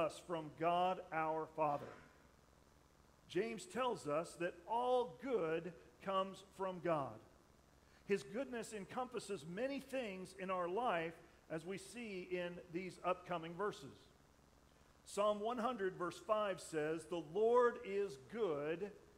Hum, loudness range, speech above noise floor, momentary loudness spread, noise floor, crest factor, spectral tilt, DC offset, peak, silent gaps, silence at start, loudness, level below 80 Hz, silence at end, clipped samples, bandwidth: none; 6 LU; 27 dB; 11 LU; -69 dBFS; 20 dB; -5 dB/octave; under 0.1%; -24 dBFS; none; 0 s; -42 LUFS; -74 dBFS; 0.1 s; under 0.1%; 15.5 kHz